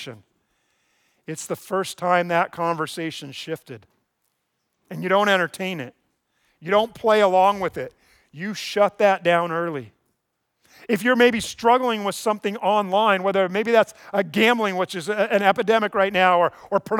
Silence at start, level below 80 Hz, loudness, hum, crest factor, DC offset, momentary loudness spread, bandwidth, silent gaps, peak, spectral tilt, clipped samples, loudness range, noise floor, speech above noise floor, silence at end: 0 s; -66 dBFS; -21 LUFS; none; 18 dB; under 0.1%; 16 LU; 19 kHz; none; -4 dBFS; -4.5 dB/octave; under 0.1%; 6 LU; -75 dBFS; 54 dB; 0 s